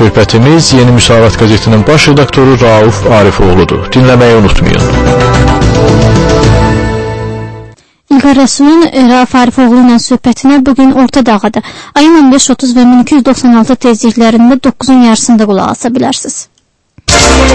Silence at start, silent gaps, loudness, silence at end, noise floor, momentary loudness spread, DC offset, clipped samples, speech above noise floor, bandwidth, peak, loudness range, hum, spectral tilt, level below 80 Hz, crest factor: 0 s; none; -5 LUFS; 0 s; -43 dBFS; 7 LU; under 0.1%; 5%; 38 dB; 11 kHz; 0 dBFS; 3 LU; none; -5.5 dB/octave; -20 dBFS; 6 dB